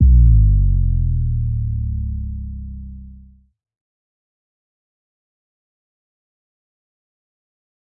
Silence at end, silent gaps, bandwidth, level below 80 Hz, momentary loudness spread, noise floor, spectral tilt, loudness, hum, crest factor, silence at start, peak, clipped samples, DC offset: 4.85 s; none; 0.4 kHz; -20 dBFS; 21 LU; -45 dBFS; -17 dB/octave; -18 LUFS; none; 16 dB; 0 s; -2 dBFS; under 0.1%; under 0.1%